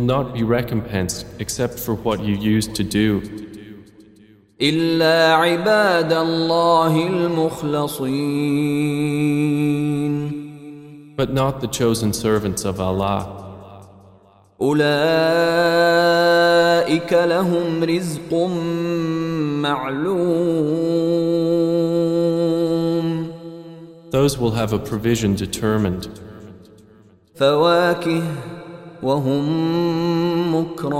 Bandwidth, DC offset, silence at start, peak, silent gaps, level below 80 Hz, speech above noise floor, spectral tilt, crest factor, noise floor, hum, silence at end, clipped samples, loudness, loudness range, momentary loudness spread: 16 kHz; under 0.1%; 0 s; -2 dBFS; none; -48 dBFS; 32 dB; -5.5 dB/octave; 16 dB; -51 dBFS; none; 0 s; under 0.1%; -19 LUFS; 5 LU; 12 LU